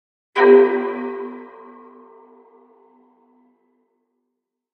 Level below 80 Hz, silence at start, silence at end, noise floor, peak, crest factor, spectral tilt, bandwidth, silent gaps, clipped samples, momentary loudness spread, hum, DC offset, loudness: -84 dBFS; 0.35 s; 3.3 s; -79 dBFS; -2 dBFS; 20 dB; -6 dB/octave; 5.2 kHz; none; under 0.1%; 25 LU; none; under 0.1%; -16 LUFS